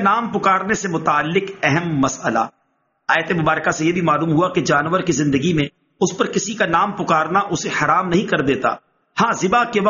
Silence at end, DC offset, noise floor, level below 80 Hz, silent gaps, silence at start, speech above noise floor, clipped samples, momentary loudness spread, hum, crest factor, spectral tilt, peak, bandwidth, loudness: 0 s; under 0.1%; -66 dBFS; -52 dBFS; none; 0 s; 49 dB; under 0.1%; 5 LU; none; 18 dB; -4.5 dB/octave; 0 dBFS; 7.4 kHz; -18 LUFS